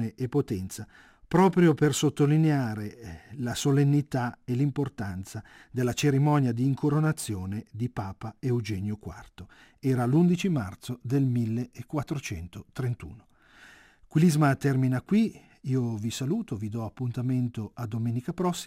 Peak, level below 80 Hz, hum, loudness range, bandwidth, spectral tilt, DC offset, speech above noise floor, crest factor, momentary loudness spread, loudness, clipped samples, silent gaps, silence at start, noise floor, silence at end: -8 dBFS; -58 dBFS; none; 5 LU; 16 kHz; -6.5 dB/octave; under 0.1%; 27 dB; 18 dB; 15 LU; -27 LUFS; under 0.1%; none; 0 s; -54 dBFS; 0 s